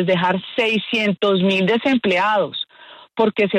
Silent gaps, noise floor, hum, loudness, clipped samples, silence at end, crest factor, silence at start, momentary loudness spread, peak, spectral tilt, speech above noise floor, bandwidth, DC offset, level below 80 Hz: none; -44 dBFS; none; -18 LUFS; under 0.1%; 0 s; 14 dB; 0 s; 8 LU; -6 dBFS; -6 dB/octave; 27 dB; 9.2 kHz; under 0.1%; -62 dBFS